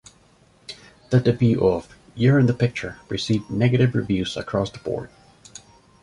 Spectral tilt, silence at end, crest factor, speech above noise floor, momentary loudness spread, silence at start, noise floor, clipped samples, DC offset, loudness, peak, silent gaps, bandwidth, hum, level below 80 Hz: -7 dB/octave; 0.95 s; 18 dB; 36 dB; 23 LU; 0.7 s; -56 dBFS; under 0.1%; under 0.1%; -22 LUFS; -4 dBFS; none; 11 kHz; none; -48 dBFS